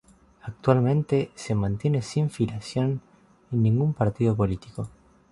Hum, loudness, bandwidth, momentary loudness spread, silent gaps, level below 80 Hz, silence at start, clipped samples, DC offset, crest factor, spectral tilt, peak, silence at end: none; -25 LUFS; 11.5 kHz; 13 LU; none; -50 dBFS; 0.45 s; under 0.1%; under 0.1%; 20 dB; -8 dB/octave; -4 dBFS; 0.45 s